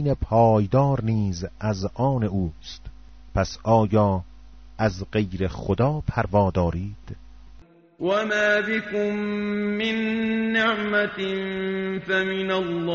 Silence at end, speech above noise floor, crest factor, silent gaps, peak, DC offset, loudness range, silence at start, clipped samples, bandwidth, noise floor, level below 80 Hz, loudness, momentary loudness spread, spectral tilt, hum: 0 s; 26 dB; 18 dB; none; -6 dBFS; under 0.1%; 2 LU; 0 s; under 0.1%; 7.2 kHz; -49 dBFS; -42 dBFS; -23 LUFS; 10 LU; -5 dB/octave; none